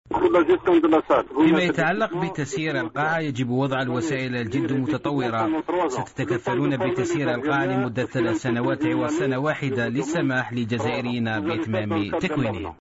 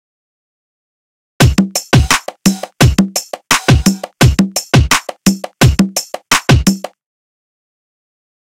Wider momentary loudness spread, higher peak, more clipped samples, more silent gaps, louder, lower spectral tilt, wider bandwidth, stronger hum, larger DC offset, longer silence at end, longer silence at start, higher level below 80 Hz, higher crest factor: about the same, 7 LU vs 5 LU; second, -8 dBFS vs 0 dBFS; neither; neither; second, -23 LUFS vs -12 LUFS; first, -6.5 dB/octave vs -4.5 dB/octave; second, 8 kHz vs 17 kHz; neither; neither; second, 0.1 s vs 1.55 s; second, 0.1 s vs 1.4 s; second, -54 dBFS vs -24 dBFS; about the same, 14 dB vs 14 dB